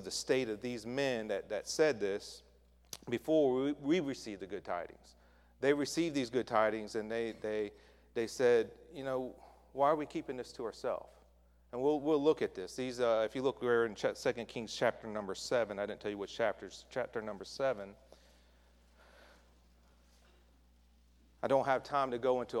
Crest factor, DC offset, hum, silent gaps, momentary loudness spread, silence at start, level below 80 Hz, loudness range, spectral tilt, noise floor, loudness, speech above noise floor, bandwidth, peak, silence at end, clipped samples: 20 dB; under 0.1%; none; none; 12 LU; 0 s; -66 dBFS; 7 LU; -4.5 dB/octave; -66 dBFS; -35 LUFS; 31 dB; 15 kHz; -16 dBFS; 0 s; under 0.1%